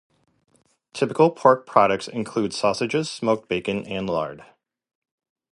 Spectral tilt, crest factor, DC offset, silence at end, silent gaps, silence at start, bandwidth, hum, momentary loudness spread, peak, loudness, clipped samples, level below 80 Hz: -5.5 dB/octave; 22 dB; under 0.1%; 1.1 s; none; 0.95 s; 11.5 kHz; none; 10 LU; 0 dBFS; -22 LUFS; under 0.1%; -60 dBFS